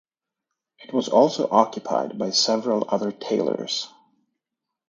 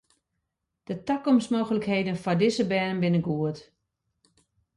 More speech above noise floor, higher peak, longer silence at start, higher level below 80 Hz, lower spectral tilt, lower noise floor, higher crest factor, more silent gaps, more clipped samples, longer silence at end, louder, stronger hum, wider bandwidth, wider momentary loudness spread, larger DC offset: first, 63 dB vs 56 dB; first, 0 dBFS vs -12 dBFS; about the same, 0.8 s vs 0.9 s; second, -74 dBFS vs -64 dBFS; second, -4 dB/octave vs -6.5 dB/octave; first, -85 dBFS vs -81 dBFS; first, 24 dB vs 16 dB; neither; neither; second, 1 s vs 1.15 s; first, -22 LUFS vs -26 LUFS; neither; second, 9.4 kHz vs 11.5 kHz; about the same, 9 LU vs 9 LU; neither